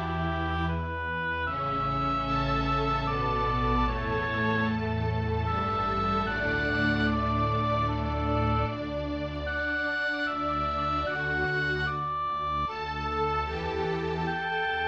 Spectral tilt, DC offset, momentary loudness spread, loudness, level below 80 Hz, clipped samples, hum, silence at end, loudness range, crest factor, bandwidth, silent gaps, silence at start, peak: -7 dB/octave; 0.1%; 4 LU; -28 LUFS; -40 dBFS; under 0.1%; none; 0 s; 2 LU; 14 dB; 7.8 kHz; none; 0 s; -14 dBFS